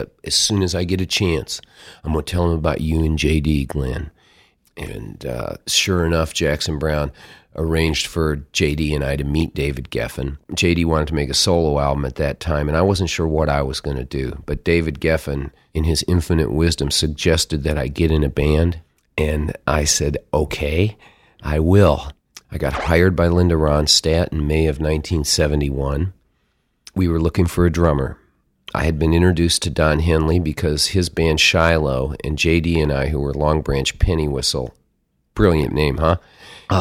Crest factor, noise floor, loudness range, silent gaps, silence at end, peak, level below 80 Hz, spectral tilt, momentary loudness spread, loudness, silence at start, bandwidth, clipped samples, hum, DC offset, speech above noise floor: 18 dB; -66 dBFS; 4 LU; none; 0 s; 0 dBFS; -28 dBFS; -5 dB/octave; 10 LU; -19 LUFS; 0 s; 16 kHz; under 0.1%; none; under 0.1%; 48 dB